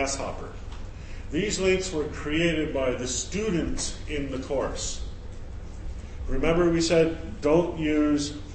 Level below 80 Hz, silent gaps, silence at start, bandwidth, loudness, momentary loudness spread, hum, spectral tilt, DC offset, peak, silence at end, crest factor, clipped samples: -36 dBFS; none; 0 s; 8.8 kHz; -26 LUFS; 18 LU; none; -4.5 dB/octave; under 0.1%; -8 dBFS; 0 s; 18 dB; under 0.1%